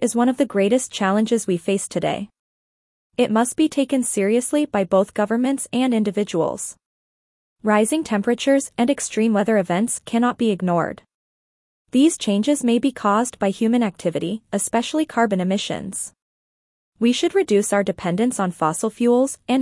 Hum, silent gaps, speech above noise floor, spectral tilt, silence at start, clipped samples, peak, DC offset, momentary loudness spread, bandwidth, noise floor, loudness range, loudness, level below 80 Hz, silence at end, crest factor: none; 2.39-3.10 s, 6.86-7.56 s, 11.14-11.85 s, 16.22-16.92 s; over 70 dB; -4.5 dB/octave; 0 s; under 0.1%; -4 dBFS; under 0.1%; 6 LU; 12 kHz; under -90 dBFS; 2 LU; -20 LUFS; -62 dBFS; 0 s; 16 dB